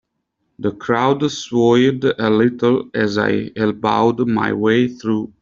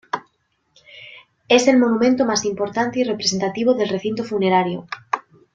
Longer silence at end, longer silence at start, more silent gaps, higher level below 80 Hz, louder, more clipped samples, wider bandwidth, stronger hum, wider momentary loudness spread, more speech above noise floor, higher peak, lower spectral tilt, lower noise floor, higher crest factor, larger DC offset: second, 0.15 s vs 0.35 s; first, 0.6 s vs 0.15 s; neither; about the same, -56 dBFS vs -60 dBFS; about the same, -17 LUFS vs -19 LUFS; neither; second, 7.6 kHz vs 9 kHz; neither; second, 7 LU vs 14 LU; first, 55 dB vs 48 dB; about the same, -2 dBFS vs -2 dBFS; first, -6 dB/octave vs -4 dB/octave; first, -72 dBFS vs -67 dBFS; about the same, 14 dB vs 18 dB; neither